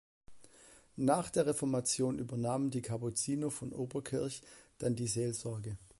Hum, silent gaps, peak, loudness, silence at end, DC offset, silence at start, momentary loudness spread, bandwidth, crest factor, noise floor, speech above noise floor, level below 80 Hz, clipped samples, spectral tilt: none; none; -16 dBFS; -36 LUFS; 0.15 s; under 0.1%; 0.3 s; 8 LU; 12 kHz; 20 dB; -61 dBFS; 26 dB; -64 dBFS; under 0.1%; -5 dB/octave